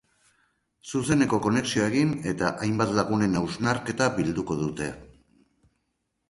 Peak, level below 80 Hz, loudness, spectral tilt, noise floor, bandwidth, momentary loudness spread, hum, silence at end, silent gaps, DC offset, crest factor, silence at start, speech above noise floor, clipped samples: -8 dBFS; -52 dBFS; -26 LUFS; -5.5 dB/octave; -77 dBFS; 11.5 kHz; 9 LU; none; 1.25 s; none; under 0.1%; 20 dB; 0.85 s; 52 dB; under 0.1%